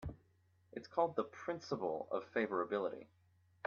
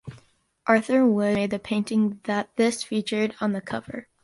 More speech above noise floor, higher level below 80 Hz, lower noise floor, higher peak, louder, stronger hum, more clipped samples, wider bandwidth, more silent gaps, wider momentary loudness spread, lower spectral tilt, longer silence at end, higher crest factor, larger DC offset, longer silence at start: about the same, 33 dB vs 35 dB; second, -66 dBFS vs -60 dBFS; first, -73 dBFS vs -59 dBFS; second, -20 dBFS vs -6 dBFS; second, -40 LUFS vs -24 LUFS; neither; neither; second, 7 kHz vs 11.5 kHz; neither; first, 15 LU vs 12 LU; about the same, -4.5 dB/octave vs -5.5 dB/octave; first, 0.6 s vs 0.2 s; about the same, 20 dB vs 18 dB; neither; about the same, 0 s vs 0.05 s